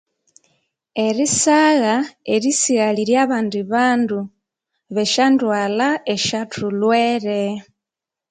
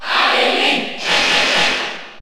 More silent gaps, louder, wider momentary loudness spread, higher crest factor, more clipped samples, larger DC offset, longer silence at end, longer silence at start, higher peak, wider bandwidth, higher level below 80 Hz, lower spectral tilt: neither; second, -18 LUFS vs -14 LUFS; first, 9 LU vs 6 LU; about the same, 16 dB vs 14 dB; neither; neither; first, 0.7 s vs 0 s; first, 0.95 s vs 0 s; about the same, -2 dBFS vs -2 dBFS; second, 9.6 kHz vs over 20 kHz; second, -62 dBFS vs -50 dBFS; first, -3.5 dB/octave vs -1 dB/octave